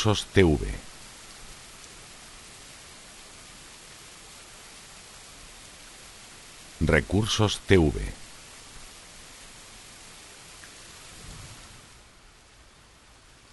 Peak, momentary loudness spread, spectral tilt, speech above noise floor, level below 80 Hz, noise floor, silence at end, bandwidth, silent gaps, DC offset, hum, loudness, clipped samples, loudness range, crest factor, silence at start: -4 dBFS; 23 LU; -5 dB/octave; 31 dB; -42 dBFS; -54 dBFS; 1.85 s; 11.5 kHz; none; under 0.1%; none; -24 LUFS; under 0.1%; 18 LU; 26 dB; 0 s